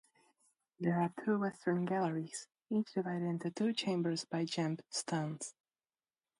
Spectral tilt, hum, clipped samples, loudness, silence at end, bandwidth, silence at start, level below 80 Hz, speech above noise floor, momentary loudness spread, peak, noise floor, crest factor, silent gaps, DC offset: -5.5 dB/octave; none; under 0.1%; -37 LUFS; 0.9 s; 11.5 kHz; 0.8 s; -82 dBFS; over 54 dB; 7 LU; -22 dBFS; under -90 dBFS; 16 dB; none; under 0.1%